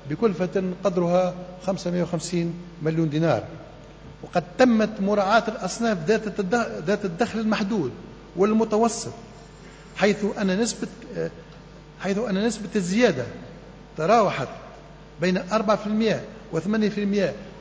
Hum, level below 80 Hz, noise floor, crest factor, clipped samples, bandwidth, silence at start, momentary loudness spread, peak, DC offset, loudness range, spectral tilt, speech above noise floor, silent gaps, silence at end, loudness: none; -52 dBFS; -44 dBFS; 20 dB; under 0.1%; 8 kHz; 0 s; 20 LU; -6 dBFS; under 0.1%; 4 LU; -5.5 dB/octave; 21 dB; none; 0 s; -24 LUFS